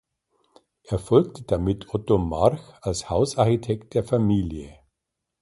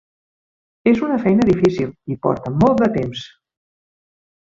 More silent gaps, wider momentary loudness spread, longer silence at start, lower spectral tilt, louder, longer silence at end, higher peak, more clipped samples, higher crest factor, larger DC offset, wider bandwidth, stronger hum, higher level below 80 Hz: neither; about the same, 10 LU vs 10 LU; about the same, 0.9 s vs 0.85 s; about the same, -7 dB/octave vs -8 dB/octave; second, -24 LUFS vs -18 LUFS; second, 0.7 s vs 1.25 s; about the same, -4 dBFS vs -2 dBFS; neither; about the same, 20 dB vs 18 dB; neither; first, 11.5 kHz vs 7.6 kHz; neither; first, -42 dBFS vs -48 dBFS